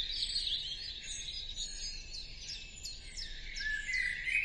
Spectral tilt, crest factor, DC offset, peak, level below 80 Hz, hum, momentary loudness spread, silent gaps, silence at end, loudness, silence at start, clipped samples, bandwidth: 0.5 dB/octave; 20 dB; under 0.1%; -20 dBFS; -50 dBFS; none; 10 LU; none; 0 s; -37 LUFS; 0 s; under 0.1%; 12 kHz